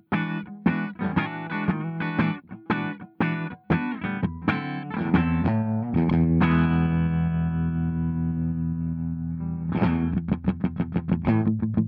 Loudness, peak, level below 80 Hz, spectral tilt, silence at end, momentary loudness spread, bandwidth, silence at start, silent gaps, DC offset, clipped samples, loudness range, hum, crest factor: -25 LUFS; -8 dBFS; -44 dBFS; -10.5 dB/octave; 0 s; 8 LU; 4.7 kHz; 0.1 s; none; under 0.1%; under 0.1%; 4 LU; none; 18 dB